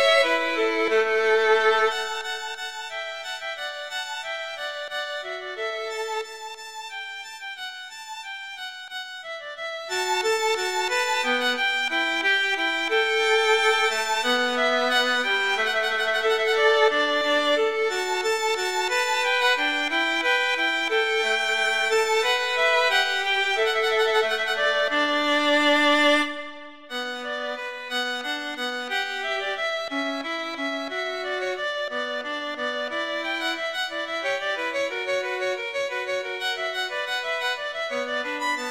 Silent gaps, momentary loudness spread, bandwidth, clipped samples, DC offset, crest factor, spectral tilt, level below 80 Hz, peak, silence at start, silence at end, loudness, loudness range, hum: none; 13 LU; 16.5 kHz; under 0.1%; 0.2%; 18 dB; -0.5 dB/octave; -70 dBFS; -8 dBFS; 0 s; 0 s; -23 LUFS; 10 LU; none